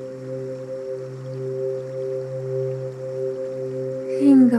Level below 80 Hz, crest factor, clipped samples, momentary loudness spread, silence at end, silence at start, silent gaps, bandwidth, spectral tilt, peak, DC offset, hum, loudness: -70 dBFS; 16 dB; under 0.1%; 11 LU; 0 s; 0 s; none; 9.8 kHz; -9 dB/octave; -6 dBFS; under 0.1%; none; -25 LUFS